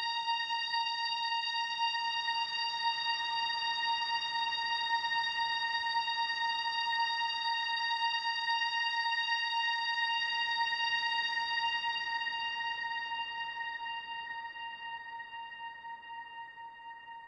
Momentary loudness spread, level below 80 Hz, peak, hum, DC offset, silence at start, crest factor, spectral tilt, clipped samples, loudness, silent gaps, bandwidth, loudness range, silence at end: 13 LU; -76 dBFS; -22 dBFS; none; under 0.1%; 0 s; 14 dB; 1 dB/octave; under 0.1%; -32 LUFS; none; 9.8 kHz; 8 LU; 0 s